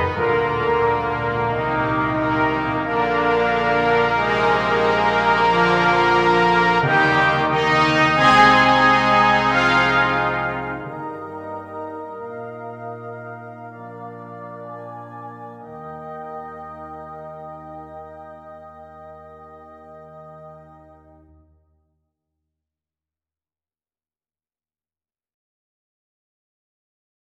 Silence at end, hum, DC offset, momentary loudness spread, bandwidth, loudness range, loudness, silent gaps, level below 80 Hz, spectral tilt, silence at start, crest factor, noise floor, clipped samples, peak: 6.7 s; none; under 0.1%; 21 LU; 10.5 kHz; 21 LU; -17 LUFS; none; -46 dBFS; -5.5 dB/octave; 0 s; 20 dB; under -90 dBFS; under 0.1%; -2 dBFS